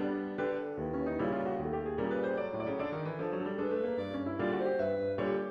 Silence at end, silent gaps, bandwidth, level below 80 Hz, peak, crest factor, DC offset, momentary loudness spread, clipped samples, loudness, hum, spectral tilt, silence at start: 0 s; none; 6.2 kHz; -60 dBFS; -20 dBFS; 14 dB; under 0.1%; 4 LU; under 0.1%; -34 LUFS; none; -9 dB/octave; 0 s